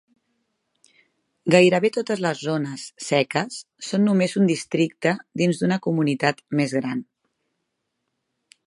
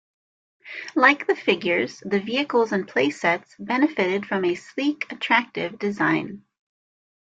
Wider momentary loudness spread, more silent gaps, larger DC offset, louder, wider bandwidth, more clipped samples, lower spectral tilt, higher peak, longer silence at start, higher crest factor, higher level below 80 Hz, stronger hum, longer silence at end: about the same, 12 LU vs 10 LU; neither; neither; about the same, -22 LUFS vs -22 LUFS; first, 11.5 kHz vs 8 kHz; neither; about the same, -5.5 dB/octave vs -5 dB/octave; about the same, -2 dBFS vs -4 dBFS; first, 1.45 s vs 0.65 s; about the same, 22 dB vs 20 dB; about the same, -70 dBFS vs -68 dBFS; neither; first, 1.65 s vs 1 s